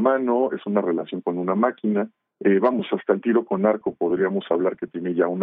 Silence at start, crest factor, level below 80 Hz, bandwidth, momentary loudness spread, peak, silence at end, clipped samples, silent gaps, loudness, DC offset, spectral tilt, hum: 0 s; 16 dB; -72 dBFS; 3.9 kHz; 6 LU; -6 dBFS; 0 s; under 0.1%; none; -23 LUFS; under 0.1%; -6 dB/octave; none